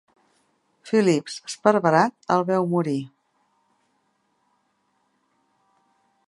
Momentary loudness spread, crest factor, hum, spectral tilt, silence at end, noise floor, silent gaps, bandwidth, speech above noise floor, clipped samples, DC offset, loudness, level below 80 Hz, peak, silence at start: 10 LU; 24 dB; none; -6 dB/octave; 3.2 s; -70 dBFS; none; 11.5 kHz; 49 dB; under 0.1%; under 0.1%; -22 LUFS; -72 dBFS; -2 dBFS; 0.85 s